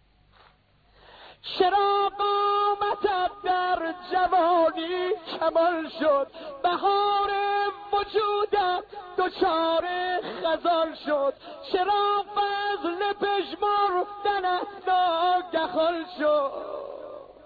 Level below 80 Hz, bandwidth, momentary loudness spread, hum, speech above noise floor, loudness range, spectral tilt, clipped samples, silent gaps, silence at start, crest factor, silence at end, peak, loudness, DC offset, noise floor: -60 dBFS; 4.9 kHz; 7 LU; none; 36 dB; 2 LU; -5.5 dB/octave; under 0.1%; none; 1.15 s; 16 dB; 0.15 s; -10 dBFS; -25 LUFS; under 0.1%; -61 dBFS